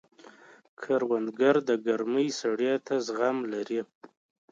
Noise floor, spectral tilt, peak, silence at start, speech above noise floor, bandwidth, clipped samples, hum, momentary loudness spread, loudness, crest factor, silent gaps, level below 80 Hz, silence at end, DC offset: -53 dBFS; -4.5 dB/octave; -12 dBFS; 0.8 s; 26 dB; 7.6 kHz; under 0.1%; none; 9 LU; -28 LUFS; 18 dB; 3.95-4.01 s; -80 dBFS; 0.45 s; under 0.1%